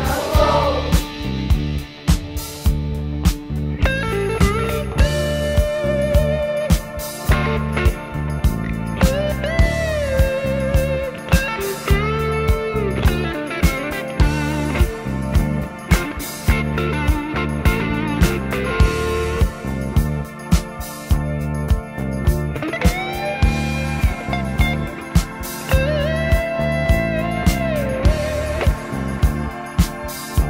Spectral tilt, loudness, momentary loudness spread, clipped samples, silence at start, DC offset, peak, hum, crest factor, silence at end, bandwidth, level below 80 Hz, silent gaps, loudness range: -6 dB/octave; -20 LUFS; 6 LU; under 0.1%; 0 s; under 0.1%; -2 dBFS; none; 18 dB; 0 s; 16.5 kHz; -22 dBFS; none; 2 LU